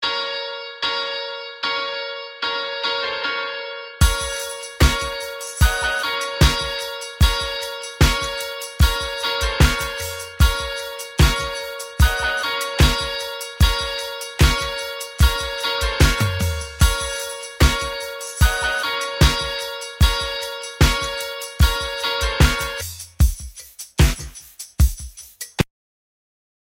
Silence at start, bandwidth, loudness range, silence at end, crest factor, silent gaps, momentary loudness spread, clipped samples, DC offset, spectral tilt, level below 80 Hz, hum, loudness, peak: 0 s; 17 kHz; 3 LU; 1.15 s; 20 dB; none; 11 LU; under 0.1%; under 0.1%; -4 dB/octave; -24 dBFS; none; -21 LUFS; 0 dBFS